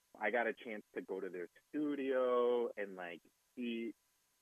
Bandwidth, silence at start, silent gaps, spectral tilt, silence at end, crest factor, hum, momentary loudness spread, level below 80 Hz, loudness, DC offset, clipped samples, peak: 13 kHz; 0.15 s; none; -6 dB/octave; 0.5 s; 18 dB; none; 15 LU; under -90 dBFS; -40 LUFS; under 0.1%; under 0.1%; -22 dBFS